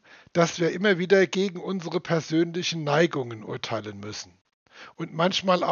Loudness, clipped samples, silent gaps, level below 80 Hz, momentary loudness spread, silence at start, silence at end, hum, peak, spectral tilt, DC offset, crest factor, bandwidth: -25 LUFS; under 0.1%; 4.41-4.45 s, 4.54-4.66 s; -72 dBFS; 15 LU; 0.35 s; 0 s; none; -4 dBFS; -4 dB/octave; under 0.1%; 20 dB; 7.2 kHz